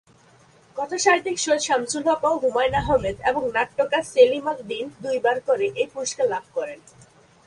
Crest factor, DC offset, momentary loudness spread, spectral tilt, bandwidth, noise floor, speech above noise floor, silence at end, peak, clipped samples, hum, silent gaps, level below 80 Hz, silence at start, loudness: 18 dB; under 0.1%; 12 LU; -3 dB/octave; 11.5 kHz; -54 dBFS; 32 dB; 0.7 s; -4 dBFS; under 0.1%; none; none; -48 dBFS; 0.75 s; -22 LUFS